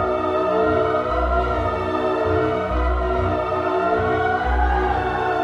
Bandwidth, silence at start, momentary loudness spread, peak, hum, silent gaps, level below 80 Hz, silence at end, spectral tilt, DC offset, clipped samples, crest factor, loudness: 7.8 kHz; 0 s; 3 LU; -8 dBFS; none; none; -28 dBFS; 0 s; -7.5 dB/octave; under 0.1%; under 0.1%; 12 dB; -21 LUFS